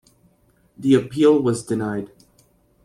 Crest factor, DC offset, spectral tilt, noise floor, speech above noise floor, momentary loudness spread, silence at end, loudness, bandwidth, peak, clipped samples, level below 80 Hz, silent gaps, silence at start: 18 dB; under 0.1%; -6.5 dB/octave; -60 dBFS; 41 dB; 13 LU; 0.8 s; -20 LUFS; 13.5 kHz; -4 dBFS; under 0.1%; -58 dBFS; none; 0.8 s